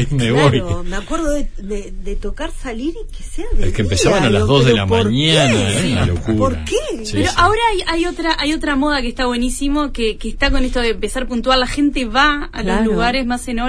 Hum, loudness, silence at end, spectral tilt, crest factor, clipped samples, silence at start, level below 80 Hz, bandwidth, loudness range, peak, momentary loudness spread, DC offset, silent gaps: none; -16 LUFS; 0 s; -5 dB/octave; 16 dB; under 0.1%; 0 s; -24 dBFS; 11 kHz; 6 LU; 0 dBFS; 13 LU; under 0.1%; none